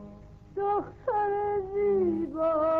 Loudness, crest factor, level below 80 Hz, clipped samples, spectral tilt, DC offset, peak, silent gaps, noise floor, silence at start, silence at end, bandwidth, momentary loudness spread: -28 LUFS; 10 dB; -54 dBFS; under 0.1%; -9.5 dB/octave; under 0.1%; -18 dBFS; none; -48 dBFS; 0 s; 0 s; 4.4 kHz; 7 LU